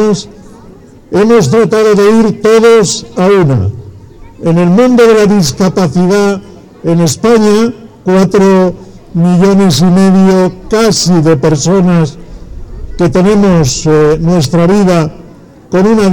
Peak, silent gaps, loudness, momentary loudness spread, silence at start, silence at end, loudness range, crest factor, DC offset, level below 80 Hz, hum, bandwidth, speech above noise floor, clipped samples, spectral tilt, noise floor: 0 dBFS; none; -8 LUFS; 9 LU; 0 s; 0 s; 2 LU; 8 dB; under 0.1%; -32 dBFS; none; 17.5 kHz; 27 dB; under 0.1%; -6 dB/octave; -34 dBFS